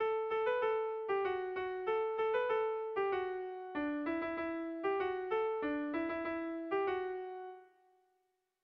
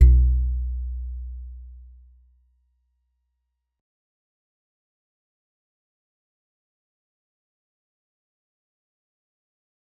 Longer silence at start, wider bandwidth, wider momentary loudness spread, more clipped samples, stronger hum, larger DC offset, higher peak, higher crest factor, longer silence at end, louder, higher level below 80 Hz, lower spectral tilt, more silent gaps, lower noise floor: about the same, 0 s vs 0 s; first, 5.4 kHz vs 2.1 kHz; second, 6 LU vs 24 LU; neither; neither; neither; second, -24 dBFS vs -2 dBFS; second, 14 dB vs 24 dB; second, 1 s vs 8.2 s; second, -37 LUFS vs -24 LUFS; second, -72 dBFS vs -28 dBFS; second, -2.5 dB/octave vs -11.5 dB/octave; neither; about the same, -81 dBFS vs -79 dBFS